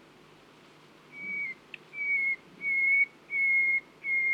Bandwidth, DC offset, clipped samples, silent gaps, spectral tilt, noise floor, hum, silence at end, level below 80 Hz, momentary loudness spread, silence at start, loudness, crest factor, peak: 8.6 kHz; under 0.1%; under 0.1%; none; -3 dB/octave; -56 dBFS; none; 0 s; -80 dBFS; 13 LU; 1.1 s; -27 LUFS; 14 dB; -18 dBFS